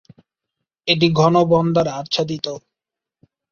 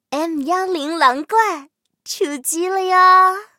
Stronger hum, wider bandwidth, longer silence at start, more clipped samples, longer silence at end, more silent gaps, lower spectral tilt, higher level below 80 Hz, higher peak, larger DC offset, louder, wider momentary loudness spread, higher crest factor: neither; second, 7.2 kHz vs 16.5 kHz; first, 0.85 s vs 0.1 s; neither; first, 0.95 s vs 0.15 s; neither; first, -6 dB/octave vs -0.5 dB/octave; first, -56 dBFS vs -74 dBFS; about the same, -2 dBFS vs 0 dBFS; neither; about the same, -18 LUFS vs -16 LUFS; about the same, 13 LU vs 12 LU; about the same, 18 dB vs 16 dB